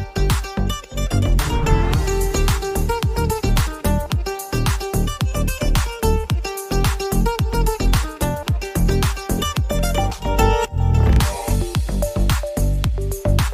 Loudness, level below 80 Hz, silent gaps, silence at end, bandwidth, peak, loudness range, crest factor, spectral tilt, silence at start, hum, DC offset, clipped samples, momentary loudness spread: -21 LUFS; -22 dBFS; none; 0 s; 16 kHz; -2 dBFS; 2 LU; 16 dB; -5.5 dB/octave; 0 s; none; under 0.1%; under 0.1%; 5 LU